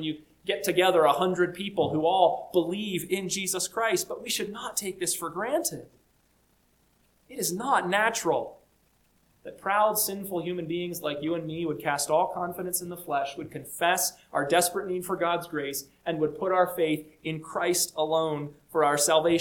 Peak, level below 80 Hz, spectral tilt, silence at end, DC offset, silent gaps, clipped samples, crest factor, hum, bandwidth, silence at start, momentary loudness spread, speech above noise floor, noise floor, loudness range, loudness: -8 dBFS; -66 dBFS; -3 dB/octave; 0 s; under 0.1%; none; under 0.1%; 20 dB; none; 19 kHz; 0 s; 10 LU; 39 dB; -66 dBFS; 4 LU; -27 LUFS